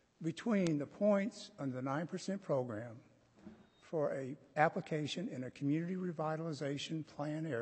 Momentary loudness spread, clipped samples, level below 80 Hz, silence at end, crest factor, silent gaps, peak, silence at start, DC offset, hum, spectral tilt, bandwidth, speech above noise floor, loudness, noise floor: 10 LU; under 0.1%; -80 dBFS; 0 s; 24 dB; none; -16 dBFS; 0.2 s; under 0.1%; none; -6.5 dB/octave; 8.4 kHz; 21 dB; -38 LUFS; -59 dBFS